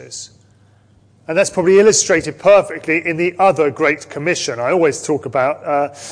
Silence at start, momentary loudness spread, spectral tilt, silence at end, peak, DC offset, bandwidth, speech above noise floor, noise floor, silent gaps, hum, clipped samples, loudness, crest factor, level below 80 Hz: 0 s; 9 LU; -3.5 dB/octave; 0 s; -2 dBFS; under 0.1%; 10.5 kHz; 36 dB; -51 dBFS; none; none; under 0.1%; -15 LUFS; 14 dB; -54 dBFS